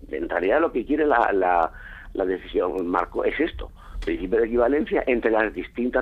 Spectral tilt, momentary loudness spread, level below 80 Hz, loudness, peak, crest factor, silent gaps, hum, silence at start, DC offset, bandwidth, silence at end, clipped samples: -7.5 dB/octave; 9 LU; -42 dBFS; -23 LUFS; -6 dBFS; 16 dB; none; none; 0 s; under 0.1%; 7 kHz; 0 s; under 0.1%